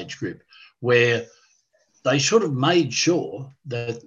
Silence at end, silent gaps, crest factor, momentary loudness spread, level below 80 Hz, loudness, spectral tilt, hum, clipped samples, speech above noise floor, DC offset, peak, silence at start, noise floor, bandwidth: 0.05 s; none; 20 dB; 14 LU; -64 dBFS; -21 LUFS; -4 dB/octave; none; under 0.1%; 42 dB; under 0.1%; -4 dBFS; 0 s; -64 dBFS; 8.2 kHz